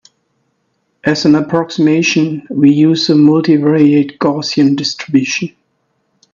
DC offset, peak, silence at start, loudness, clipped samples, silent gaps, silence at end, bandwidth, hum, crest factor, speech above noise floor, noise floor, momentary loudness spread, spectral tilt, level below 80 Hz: under 0.1%; 0 dBFS; 1.05 s; -12 LUFS; under 0.1%; none; 0.85 s; 7.4 kHz; none; 12 dB; 53 dB; -64 dBFS; 8 LU; -5.5 dB/octave; -58 dBFS